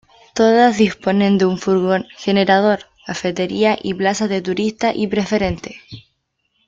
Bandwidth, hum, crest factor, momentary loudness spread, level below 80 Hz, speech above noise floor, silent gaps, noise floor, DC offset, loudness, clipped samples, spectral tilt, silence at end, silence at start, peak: 7.8 kHz; none; 16 dB; 10 LU; -48 dBFS; 52 dB; none; -68 dBFS; under 0.1%; -17 LUFS; under 0.1%; -5.5 dB/octave; 0.65 s; 0.35 s; -2 dBFS